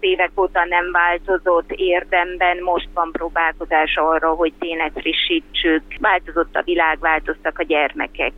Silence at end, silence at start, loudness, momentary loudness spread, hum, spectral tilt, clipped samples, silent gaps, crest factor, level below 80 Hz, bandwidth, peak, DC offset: 0 s; 0 s; -18 LUFS; 5 LU; none; -5.5 dB/octave; under 0.1%; none; 16 dB; -40 dBFS; 4.4 kHz; -4 dBFS; under 0.1%